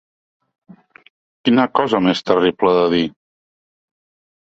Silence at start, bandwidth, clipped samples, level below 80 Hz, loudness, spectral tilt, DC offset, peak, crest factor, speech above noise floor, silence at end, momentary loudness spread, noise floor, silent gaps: 1.45 s; 7.8 kHz; under 0.1%; -56 dBFS; -16 LUFS; -6.5 dB/octave; under 0.1%; -2 dBFS; 18 dB; over 75 dB; 1.5 s; 5 LU; under -90 dBFS; none